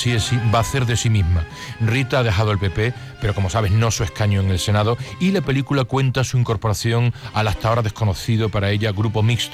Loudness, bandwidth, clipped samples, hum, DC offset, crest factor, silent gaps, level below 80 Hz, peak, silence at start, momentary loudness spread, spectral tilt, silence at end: -20 LUFS; 15 kHz; under 0.1%; none; under 0.1%; 12 dB; none; -38 dBFS; -8 dBFS; 0 s; 4 LU; -5.5 dB/octave; 0 s